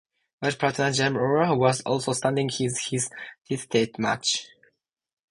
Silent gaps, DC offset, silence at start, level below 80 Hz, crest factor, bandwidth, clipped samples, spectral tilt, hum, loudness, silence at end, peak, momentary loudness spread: none; under 0.1%; 0.4 s; -62 dBFS; 20 dB; 11.5 kHz; under 0.1%; -4 dB/octave; none; -25 LUFS; 0.85 s; -6 dBFS; 8 LU